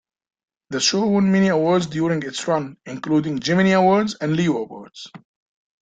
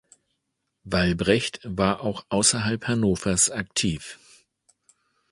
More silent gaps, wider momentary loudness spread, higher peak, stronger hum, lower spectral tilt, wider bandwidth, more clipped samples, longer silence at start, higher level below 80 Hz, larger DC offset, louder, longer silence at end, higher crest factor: neither; first, 16 LU vs 8 LU; about the same, -4 dBFS vs -4 dBFS; neither; first, -5 dB/octave vs -3.5 dB/octave; second, 9.2 kHz vs 11.5 kHz; neither; second, 0.7 s vs 0.85 s; second, -58 dBFS vs -46 dBFS; neither; first, -19 LUFS vs -23 LUFS; second, 0.65 s vs 1.15 s; about the same, 16 dB vs 20 dB